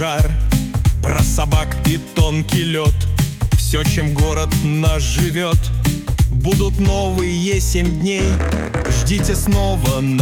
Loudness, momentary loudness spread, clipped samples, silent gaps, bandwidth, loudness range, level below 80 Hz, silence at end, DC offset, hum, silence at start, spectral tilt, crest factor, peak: -17 LUFS; 2 LU; under 0.1%; none; 19 kHz; 0 LU; -20 dBFS; 0 s; under 0.1%; none; 0 s; -5.5 dB/octave; 12 dB; -4 dBFS